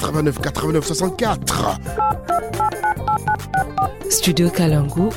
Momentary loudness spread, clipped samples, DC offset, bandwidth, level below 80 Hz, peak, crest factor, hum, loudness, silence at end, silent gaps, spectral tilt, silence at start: 5 LU; under 0.1%; under 0.1%; 17 kHz; -36 dBFS; -4 dBFS; 16 dB; none; -19 LUFS; 0 s; none; -4.5 dB/octave; 0 s